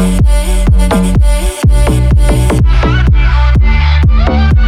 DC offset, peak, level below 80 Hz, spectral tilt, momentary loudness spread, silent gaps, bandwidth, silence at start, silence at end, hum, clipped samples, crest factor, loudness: under 0.1%; 0 dBFS; -8 dBFS; -6.5 dB/octave; 2 LU; none; 13 kHz; 0 s; 0 s; none; under 0.1%; 6 dB; -10 LUFS